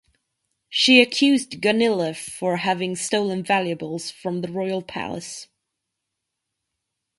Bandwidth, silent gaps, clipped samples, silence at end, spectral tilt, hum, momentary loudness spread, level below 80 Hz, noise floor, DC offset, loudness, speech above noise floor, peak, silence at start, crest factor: 11.5 kHz; none; under 0.1%; 1.75 s; -3.5 dB/octave; none; 16 LU; -66 dBFS; -81 dBFS; under 0.1%; -21 LUFS; 59 dB; 0 dBFS; 0.7 s; 24 dB